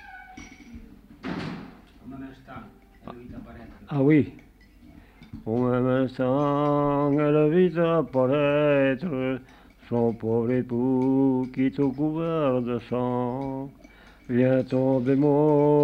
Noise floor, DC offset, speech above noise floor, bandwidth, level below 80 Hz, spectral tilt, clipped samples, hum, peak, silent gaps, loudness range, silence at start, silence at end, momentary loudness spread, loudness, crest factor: -51 dBFS; under 0.1%; 28 dB; 6.2 kHz; -54 dBFS; -9.5 dB/octave; under 0.1%; none; -10 dBFS; none; 7 LU; 0.05 s; 0 s; 22 LU; -24 LUFS; 16 dB